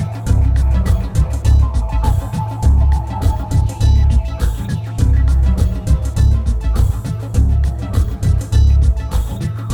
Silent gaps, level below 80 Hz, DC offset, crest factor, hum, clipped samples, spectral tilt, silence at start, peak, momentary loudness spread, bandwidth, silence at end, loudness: none; -16 dBFS; under 0.1%; 10 dB; none; under 0.1%; -7 dB/octave; 0 s; -2 dBFS; 6 LU; 12.5 kHz; 0 s; -16 LUFS